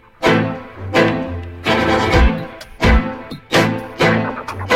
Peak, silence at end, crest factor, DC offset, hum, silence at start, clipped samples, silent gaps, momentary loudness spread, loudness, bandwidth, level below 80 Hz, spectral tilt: -2 dBFS; 0 s; 16 dB; under 0.1%; none; 0.2 s; under 0.1%; none; 12 LU; -17 LUFS; 15.5 kHz; -24 dBFS; -5.5 dB/octave